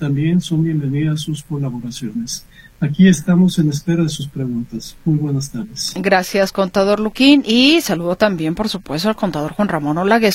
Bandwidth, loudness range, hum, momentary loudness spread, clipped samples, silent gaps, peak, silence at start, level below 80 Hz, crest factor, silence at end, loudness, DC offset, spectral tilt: 16 kHz; 4 LU; none; 12 LU; under 0.1%; none; 0 dBFS; 0 s; -44 dBFS; 16 dB; 0 s; -17 LUFS; under 0.1%; -5.5 dB/octave